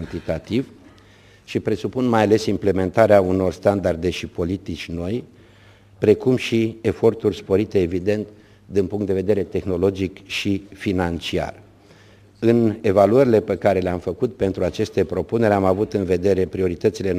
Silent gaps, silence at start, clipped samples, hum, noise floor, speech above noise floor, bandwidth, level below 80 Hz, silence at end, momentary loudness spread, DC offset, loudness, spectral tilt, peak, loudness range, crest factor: none; 0 s; under 0.1%; none; -49 dBFS; 30 dB; 15.5 kHz; -48 dBFS; 0 s; 10 LU; under 0.1%; -20 LUFS; -7 dB/octave; 0 dBFS; 4 LU; 20 dB